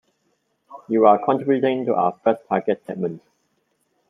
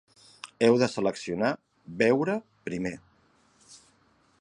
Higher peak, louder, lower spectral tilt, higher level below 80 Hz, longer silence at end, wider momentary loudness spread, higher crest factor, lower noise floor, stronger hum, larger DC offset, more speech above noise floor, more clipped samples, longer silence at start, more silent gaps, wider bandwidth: first, -2 dBFS vs -8 dBFS; first, -20 LUFS vs -27 LUFS; first, -9 dB/octave vs -5.5 dB/octave; second, -72 dBFS vs -66 dBFS; first, 0.9 s vs 0.65 s; second, 12 LU vs 22 LU; about the same, 20 dB vs 22 dB; first, -69 dBFS vs -65 dBFS; neither; neither; first, 50 dB vs 39 dB; neither; first, 0.7 s vs 0.45 s; neither; second, 3.9 kHz vs 11 kHz